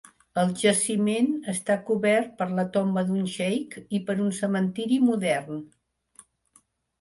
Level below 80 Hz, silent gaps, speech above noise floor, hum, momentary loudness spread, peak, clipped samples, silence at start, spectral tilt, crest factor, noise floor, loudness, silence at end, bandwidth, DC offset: -68 dBFS; none; 39 dB; none; 8 LU; -10 dBFS; under 0.1%; 0.35 s; -5 dB/octave; 16 dB; -64 dBFS; -25 LUFS; 1.35 s; 11.5 kHz; under 0.1%